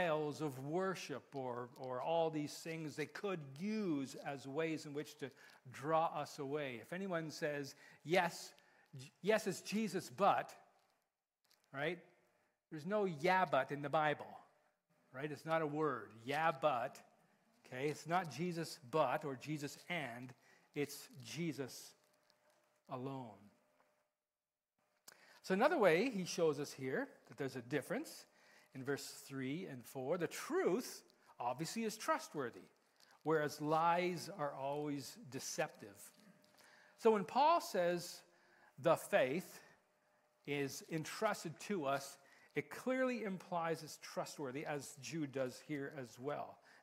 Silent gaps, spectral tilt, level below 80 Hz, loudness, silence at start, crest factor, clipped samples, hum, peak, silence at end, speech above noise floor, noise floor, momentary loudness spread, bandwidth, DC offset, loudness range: none; -5 dB/octave; -88 dBFS; -41 LUFS; 0 s; 24 dB; under 0.1%; none; -18 dBFS; 0.25 s; over 50 dB; under -90 dBFS; 16 LU; 16 kHz; under 0.1%; 7 LU